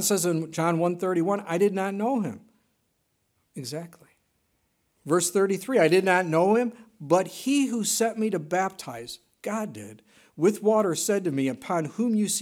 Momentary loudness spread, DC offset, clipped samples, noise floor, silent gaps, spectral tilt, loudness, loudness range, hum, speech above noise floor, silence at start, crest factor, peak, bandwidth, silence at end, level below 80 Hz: 16 LU; under 0.1%; under 0.1%; -73 dBFS; none; -4.5 dB/octave; -25 LUFS; 7 LU; none; 49 dB; 0 s; 18 dB; -6 dBFS; 17.5 kHz; 0 s; -76 dBFS